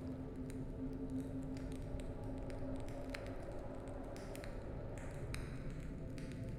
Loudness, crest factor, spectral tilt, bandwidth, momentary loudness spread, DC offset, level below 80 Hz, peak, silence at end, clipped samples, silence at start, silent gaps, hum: -47 LUFS; 20 dB; -7 dB/octave; 16 kHz; 4 LU; under 0.1%; -50 dBFS; -26 dBFS; 0 s; under 0.1%; 0 s; none; none